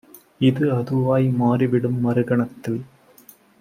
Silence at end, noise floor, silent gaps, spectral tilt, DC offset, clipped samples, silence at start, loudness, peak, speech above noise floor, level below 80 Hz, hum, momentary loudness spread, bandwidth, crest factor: 0.75 s; -50 dBFS; none; -9 dB/octave; under 0.1%; under 0.1%; 0.15 s; -21 LUFS; -6 dBFS; 31 dB; -60 dBFS; none; 9 LU; 15.5 kHz; 16 dB